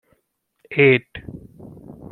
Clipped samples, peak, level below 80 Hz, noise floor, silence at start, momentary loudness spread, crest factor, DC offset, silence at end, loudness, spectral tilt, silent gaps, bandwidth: under 0.1%; -2 dBFS; -54 dBFS; -71 dBFS; 0.7 s; 26 LU; 20 dB; under 0.1%; 0.8 s; -17 LUFS; -8.5 dB/octave; none; 4.3 kHz